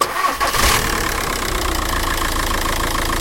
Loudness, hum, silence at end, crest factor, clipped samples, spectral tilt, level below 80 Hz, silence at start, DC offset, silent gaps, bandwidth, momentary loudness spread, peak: -18 LUFS; none; 0 s; 16 dB; under 0.1%; -2.5 dB/octave; -26 dBFS; 0 s; under 0.1%; none; 17 kHz; 5 LU; -4 dBFS